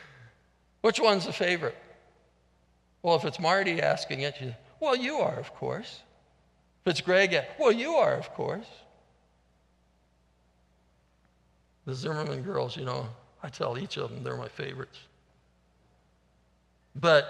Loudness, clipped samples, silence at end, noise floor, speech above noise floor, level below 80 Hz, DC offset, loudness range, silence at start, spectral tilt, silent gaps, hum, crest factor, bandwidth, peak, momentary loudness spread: -29 LUFS; under 0.1%; 0 s; -67 dBFS; 39 dB; -68 dBFS; under 0.1%; 12 LU; 0 s; -5 dB/octave; none; none; 24 dB; 11.5 kHz; -8 dBFS; 18 LU